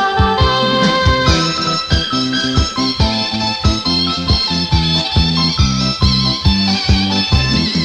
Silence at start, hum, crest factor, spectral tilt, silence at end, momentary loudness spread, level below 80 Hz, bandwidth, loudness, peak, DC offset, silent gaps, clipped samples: 0 s; none; 14 dB; -4.5 dB/octave; 0 s; 3 LU; -24 dBFS; 10 kHz; -14 LUFS; 0 dBFS; under 0.1%; none; under 0.1%